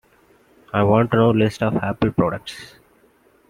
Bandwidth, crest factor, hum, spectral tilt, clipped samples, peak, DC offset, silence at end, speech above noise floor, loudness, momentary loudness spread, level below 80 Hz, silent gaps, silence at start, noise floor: 12.5 kHz; 18 dB; none; -7.5 dB/octave; under 0.1%; -2 dBFS; under 0.1%; 0.85 s; 38 dB; -19 LUFS; 14 LU; -48 dBFS; none; 0.75 s; -56 dBFS